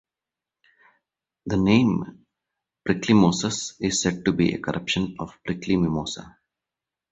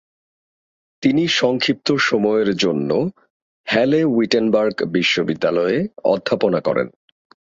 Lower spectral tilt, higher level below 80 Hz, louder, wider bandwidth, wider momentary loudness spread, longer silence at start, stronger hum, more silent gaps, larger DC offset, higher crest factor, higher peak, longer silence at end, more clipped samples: about the same, -5 dB/octave vs -5 dB/octave; first, -50 dBFS vs -58 dBFS; second, -23 LUFS vs -18 LUFS; about the same, 8.2 kHz vs 7.8 kHz; first, 15 LU vs 5 LU; first, 1.45 s vs 1 s; neither; second, none vs 3.30-3.64 s; neither; about the same, 20 dB vs 18 dB; second, -4 dBFS vs 0 dBFS; first, 0.85 s vs 0.6 s; neither